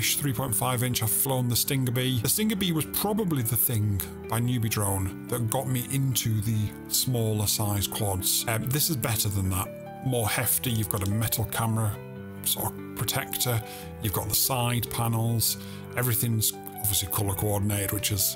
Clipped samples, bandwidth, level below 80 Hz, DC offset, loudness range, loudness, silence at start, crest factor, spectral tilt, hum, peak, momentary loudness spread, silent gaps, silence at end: under 0.1%; 19 kHz; -52 dBFS; under 0.1%; 2 LU; -26 LUFS; 0 s; 22 dB; -4 dB/octave; none; -4 dBFS; 7 LU; none; 0 s